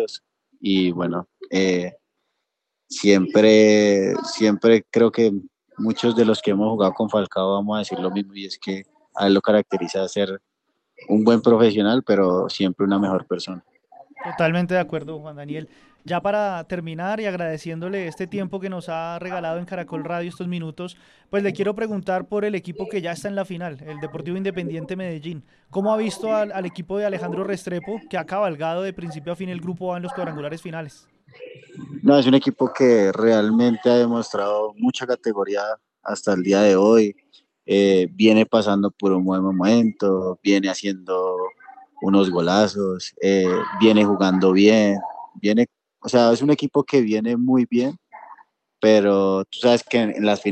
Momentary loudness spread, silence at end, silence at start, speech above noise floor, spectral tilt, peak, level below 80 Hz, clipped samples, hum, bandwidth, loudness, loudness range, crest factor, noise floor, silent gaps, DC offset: 15 LU; 0 s; 0 s; 60 dB; -6 dB/octave; -2 dBFS; -66 dBFS; under 0.1%; none; 11 kHz; -20 LUFS; 9 LU; 18 dB; -79 dBFS; none; under 0.1%